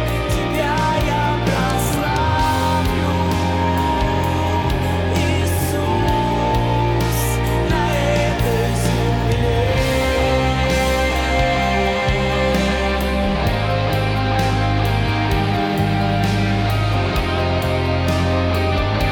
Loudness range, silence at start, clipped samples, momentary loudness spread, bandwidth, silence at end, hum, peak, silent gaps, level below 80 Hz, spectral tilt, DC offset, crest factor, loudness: 1 LU; 0 s; under 0.1%; 2 LU; 19 kHz; 0 s; none; -6 dBFS; none; -26 dBFS; -5.5 dB/octave; under 0.1%; 12 dB; -18 LUFS